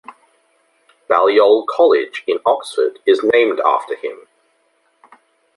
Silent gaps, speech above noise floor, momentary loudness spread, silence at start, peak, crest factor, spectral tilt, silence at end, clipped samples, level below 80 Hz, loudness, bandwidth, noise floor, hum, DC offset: none; 47 dB; 9 LU; 1.1 s; -2 dBFS; 16 dB; -3.5 dB/octave; 1.4 s; under 0.1%; -68 dBFS; -15 LUFS; 11.5 kHz; -62 dBFS; none; under 0.1%